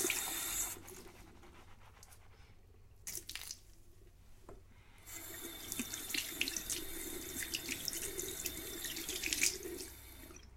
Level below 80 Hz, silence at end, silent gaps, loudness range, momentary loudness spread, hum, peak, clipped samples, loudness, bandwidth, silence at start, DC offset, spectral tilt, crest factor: -60 dBFS; 0 s; none; 12 LU; 24 LU; none; -14 dBFS; under 0.1%; -39 LUFS; 17 kHz; 0 s; under 0.1%; -1 dB/octave; 30 dB